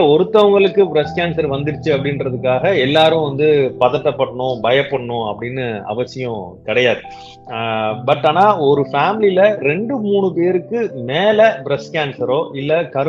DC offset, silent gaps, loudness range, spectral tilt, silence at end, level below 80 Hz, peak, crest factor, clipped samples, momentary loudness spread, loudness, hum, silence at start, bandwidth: under 0.1%; none; 4 LU; -7 dB/octave; 0 s; -52 dBFS; 0 dBFS; 14 dB; under 0.1%; 10 LU; -16 LUFS; none; 0 s; 7.4 kHz